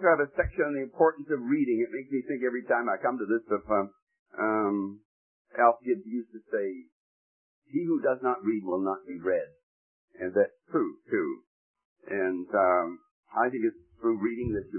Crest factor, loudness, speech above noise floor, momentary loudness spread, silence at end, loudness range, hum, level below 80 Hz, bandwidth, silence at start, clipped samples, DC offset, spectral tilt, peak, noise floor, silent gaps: 22 dB; -29 LUFS; over 62 dB; 11 LU; 0 s; 3 LU; none; -56 dBFS; 3 kHz; 0 s; under 0.1%; under 0.1%; -12 dB/octave; -8 dBFS; under -90 dBFS; 4.02-4.07 s, 4.19-4.26 s, 5.05-5.45 s, 6.92-7.62 s, 9.63-10.08 s, 11.47-11.74 s, 11.85-11.96 s, 13.11-13.23 s